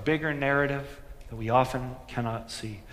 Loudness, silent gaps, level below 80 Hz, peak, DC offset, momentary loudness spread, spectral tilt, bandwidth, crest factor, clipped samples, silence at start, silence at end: -29 LUFS; none; -48 dBFS; -8 dBFS; under 0.1%; 15 LU; -6 dB/octave; 15.5 kHz; 20 dB; under 0.1%; 0 s; 0 s